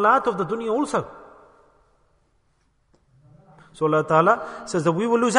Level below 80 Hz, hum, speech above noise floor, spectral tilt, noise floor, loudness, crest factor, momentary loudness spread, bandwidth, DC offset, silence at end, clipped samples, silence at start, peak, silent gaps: -62 dBFS; none; 45 dB; -5.5 dB/octave; -65 dBFS; -22 LUFS; 22 dB; 9 LU; 10.5 kHz; under 0.1%; 0 s; under 0.1%; 0 s; -2 dBFS; none